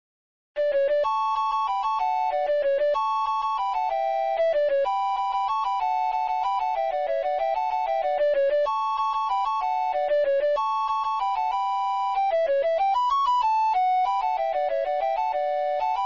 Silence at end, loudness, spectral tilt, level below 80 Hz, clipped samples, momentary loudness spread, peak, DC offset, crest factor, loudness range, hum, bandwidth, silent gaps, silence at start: 0 s; -24 LUFS; -1.5 dB/octave; -60 dBFS; under 0.1%; 3 LU; -16 dBFS; 0.2%; 8 dB; 2 LU; none; 7.4 kHz; none; 0.55 s